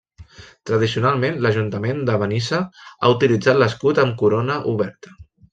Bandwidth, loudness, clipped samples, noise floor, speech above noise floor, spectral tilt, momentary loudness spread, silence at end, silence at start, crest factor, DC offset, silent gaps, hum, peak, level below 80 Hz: 8.6 kHz; -19 LUFS; under 0.1%; -43 dBFS; 25 dB; -6.5 dB/octave; 8 LU; 0.3 s; 0.2 s; 18 dB; under 0.1%; none; none; -2 dBFS; -54 dBFS